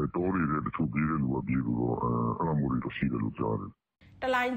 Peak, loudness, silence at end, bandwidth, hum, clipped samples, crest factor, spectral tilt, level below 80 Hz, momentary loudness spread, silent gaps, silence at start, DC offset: -16 dBFS; -30 LUFS; 0 s; 15 kHz; none; under 0.1%; 14 dB; -8.5 dB/octave; -50 dBFS; 4 LU; none; 0 s; under 0.1%